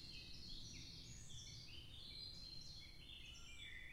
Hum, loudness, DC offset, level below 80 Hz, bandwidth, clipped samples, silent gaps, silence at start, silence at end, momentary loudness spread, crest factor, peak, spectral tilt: none; -55 LUFS; under 0.1%; -62 dBFS; 16 kHz; under 0.1%; none; 0 s; 0 s; 4 LU; 14 dB; -40 dBFS; -2 dB/octave